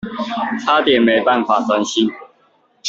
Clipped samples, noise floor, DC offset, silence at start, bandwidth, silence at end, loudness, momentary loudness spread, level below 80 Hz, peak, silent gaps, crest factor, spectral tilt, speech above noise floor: under 0.1%; -57 dBFS; under 0.1%; 0.05 s; 7.8 kHz; 0 s; -16 LUFS; 8 LU; -58 dBFS; -2 dBFS; none; 14 dB; -3.5 dB/octave; 42 dB